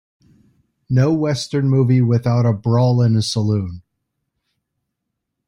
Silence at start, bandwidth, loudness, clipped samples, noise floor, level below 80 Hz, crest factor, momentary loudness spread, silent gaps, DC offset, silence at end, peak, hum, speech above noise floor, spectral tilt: 0.9 s; 11 kHz; -17 LUFS; under 0.1%; -78 dBFS; -52 dBFS; 14 dB; 6 LU; none; under 0.1%; 1.7 s; -4 dBFS; none; 62 dB; -7 dB/octave